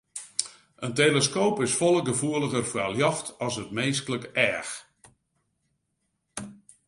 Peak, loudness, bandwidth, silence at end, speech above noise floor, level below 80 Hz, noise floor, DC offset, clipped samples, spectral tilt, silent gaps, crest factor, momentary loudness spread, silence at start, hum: -4 dBFS; -26 LUFS; 11.5 kHz; 0.35 s; 51 dB; -64 dBFS; -77 dBFS; under 0.1%; under 0.1%; -3.5 dB/octave; none; 24 dB; 17 LU; 0.15 s; none